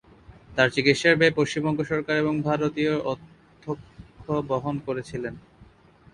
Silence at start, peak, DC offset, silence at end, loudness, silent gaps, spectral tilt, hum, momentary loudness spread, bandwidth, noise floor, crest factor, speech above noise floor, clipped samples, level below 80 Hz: 0.3 s; -4 dBFS; under 0.1%; 0.5 s; -24 LUFS; none; -5.5 dB/octave; none; 16 LU; 11 kHz; -54 dBFS; 22 dB; 30 dB; under 0.1%; -56 dBFS